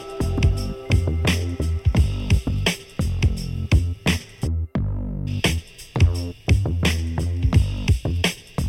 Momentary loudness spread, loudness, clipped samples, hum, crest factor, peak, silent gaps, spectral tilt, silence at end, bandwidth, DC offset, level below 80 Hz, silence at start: 7 LU; -23 LUFS; under 0.1%; none; 16 dB; -6 dBFS; none; -5.5 dB/octave; 0 s; 15.5 kHz; under 0.1%; -26 dBFS; 0 s